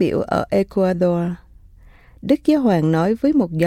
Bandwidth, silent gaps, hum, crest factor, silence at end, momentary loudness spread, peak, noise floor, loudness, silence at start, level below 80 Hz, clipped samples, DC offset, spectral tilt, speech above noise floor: 15 kHz; none; none; 14 dB; 0 s; 8 LU; -4 dBFS; -46 dBFS; -18 LUFS; 0 s; -46 dBFS; under 0.1%; under 0.1%; -8 dB/octave; 29 dB